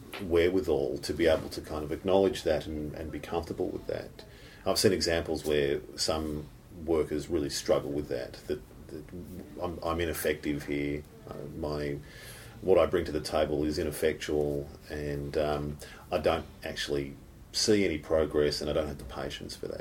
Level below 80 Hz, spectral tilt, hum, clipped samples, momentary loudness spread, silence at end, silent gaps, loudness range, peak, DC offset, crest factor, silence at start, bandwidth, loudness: -48 dBFS; -4.5 dB/octave; none; under 0.1%; 15 LU; 0 s; none; 5 LU; -10 dBFS; under 0.1%; 20 dB; 0 s; 17 kHz; -31 LUFS